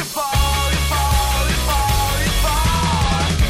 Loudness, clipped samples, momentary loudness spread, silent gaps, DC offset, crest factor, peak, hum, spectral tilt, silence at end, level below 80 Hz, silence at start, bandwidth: -18 LUFS; under 0.1%; 1 LU; none; under 0.1%; 12 dB; -6 dBFS; none; -3.5 dB/octave; 0 s; -20 dBFS; 0 s; 16 kHz